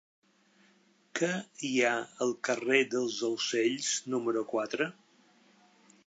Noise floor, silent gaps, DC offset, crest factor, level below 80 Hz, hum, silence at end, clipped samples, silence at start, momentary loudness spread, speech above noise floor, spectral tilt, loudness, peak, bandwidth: -66 dBFS; none; under 0.1%; 22 dB; -88 dBFS; none; 1.15 s; under 0.1%; 1.15 s; 7 LU; 35 dB; -3 dB/octave; -31 LUFS; -10 dBFS; 9.2 kHz